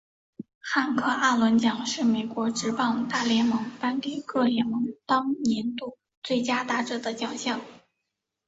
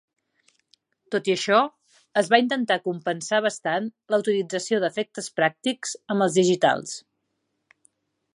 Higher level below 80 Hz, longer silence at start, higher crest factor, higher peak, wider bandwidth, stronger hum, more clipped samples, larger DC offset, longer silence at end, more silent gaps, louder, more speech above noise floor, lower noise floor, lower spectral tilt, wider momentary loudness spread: first, -68 dBFS vs -76 dBFS; second, 0.4 s vs 1.1 s; about the same, 18 dB vs 22 dB; second, -8 dBFS vs -2 dBFS; second, 8 kHz vs 11.5 kHz; neither; neither; neither; second, 0.7 s vs 1.35 s; first, 0.55-0.61 s, 6.17-6.22 s vs none; about the same, -26 LUFS vs -24 LUFS; first, 57 dB vs 53 dB; first, -83 dBFS vs -76 dBFS; about the same, -4 dB/octave vs -4 dB/octave; about the same, 9 LU vs 10 LU